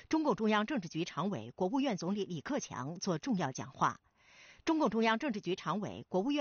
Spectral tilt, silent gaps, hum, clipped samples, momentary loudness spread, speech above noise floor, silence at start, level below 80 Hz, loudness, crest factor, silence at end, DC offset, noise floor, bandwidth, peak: -4.5 dB/octave; none; none; under 0.1%; 8 LU; 26 dB; 0.1 s; -70 dBFS; -35 LUFS; 18 dB; 0 s; under 0.1%; -61 dBFS; 7 kHz; -18 dBFS